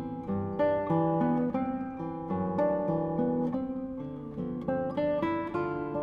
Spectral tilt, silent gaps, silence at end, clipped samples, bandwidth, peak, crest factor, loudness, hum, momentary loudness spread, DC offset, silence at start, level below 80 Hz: -10 dB/octave; none; 0 s; under 0.1%; 5.2 kHz; -16 dBFS; 14 dB; -31 LUFS; none; 9 LU; under 0.1%; 0 s; -56 dBFS